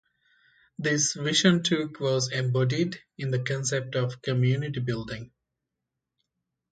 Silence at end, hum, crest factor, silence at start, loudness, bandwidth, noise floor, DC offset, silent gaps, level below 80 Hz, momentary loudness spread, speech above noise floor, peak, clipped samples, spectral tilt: 1.45 s; none; 22 dB; 0.8 s; -26 LUFS; 9.2 kHz; -85 dBFS; under 0.1%; none; -62 dBFS; 10 LU; 59 dB; -6 dBFS; under 0.1%; -4.5 dB/octave